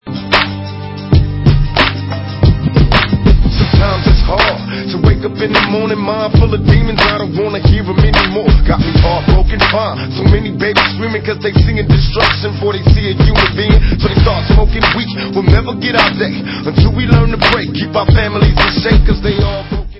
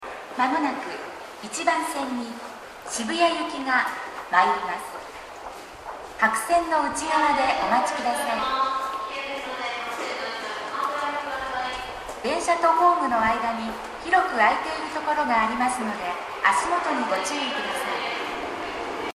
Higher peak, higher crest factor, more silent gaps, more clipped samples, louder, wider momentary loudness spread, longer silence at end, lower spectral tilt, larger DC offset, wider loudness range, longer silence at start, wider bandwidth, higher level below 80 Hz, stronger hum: first, 0 dBFS vs -4 dBFS; second, 10 dB vs 20 dB; neither; first, 0.4% vs under 0.1%; first, -12 LUFS vs -24 LUFS; second, 6 LU vs 14 LU; about the same, 0 s vs 0.05 s; first, -8 dB/octave vs -2.5 dB/octave; neither; second, 1 LU vs 5 LU; about the same, 0.05 s vs 0 s; second, 8 kHz vs 14.5 kHz; first, -16 dBFS vs -56 dBFS; neither